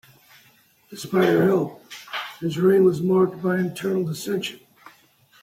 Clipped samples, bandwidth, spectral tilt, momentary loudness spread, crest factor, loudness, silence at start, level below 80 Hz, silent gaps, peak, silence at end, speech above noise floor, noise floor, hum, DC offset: under 0.1%; 16 kHz; -6.5 dB/octave; 15 LU; 16 dB; -22 LUFS; 0.9 s; -66 dBFS; none; -8 dBFS; 0.85 s; 37 dB; -57 dBFS; none; under 0.1%